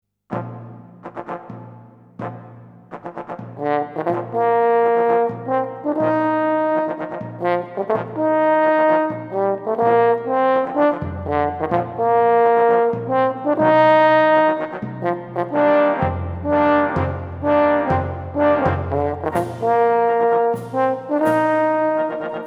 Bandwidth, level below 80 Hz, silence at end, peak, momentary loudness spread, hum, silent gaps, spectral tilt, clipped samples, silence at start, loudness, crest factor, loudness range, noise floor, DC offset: 12.5 kHz; -48 dBFS; 0 s; -2 dBFS; 16 LU; none; none; -8 dB/octave; under 0.1%; 0.3 s; -18 LUFS; 16 dB; 6 LU; -43 dBFS; under 0.1%